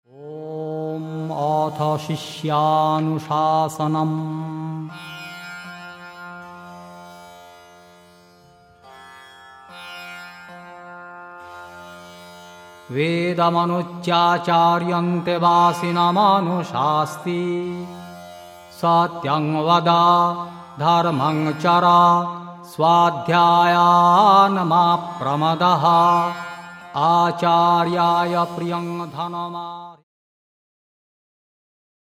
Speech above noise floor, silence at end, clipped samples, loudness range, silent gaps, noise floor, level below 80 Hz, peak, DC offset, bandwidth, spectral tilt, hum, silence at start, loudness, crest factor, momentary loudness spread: 33 dB; 2.05 s; under 0.1%; 22 LU; none; -51 dBFS; -68 dBFS; -2 dBFS; under 0.1%; 15 kHz; -6 dB/octave; none; 0.2 s; -18 LUFS; 18 dB; 23 LU